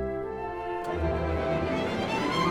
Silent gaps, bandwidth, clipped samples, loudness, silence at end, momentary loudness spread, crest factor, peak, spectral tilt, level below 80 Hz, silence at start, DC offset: none; 15.5 kHz; under 0.1%; -30 LUFS; 0 s; 6 LU; 14 dB; -14 dBFS; -6 dB/octave; -40 dBFS; 0 s; under 0.1%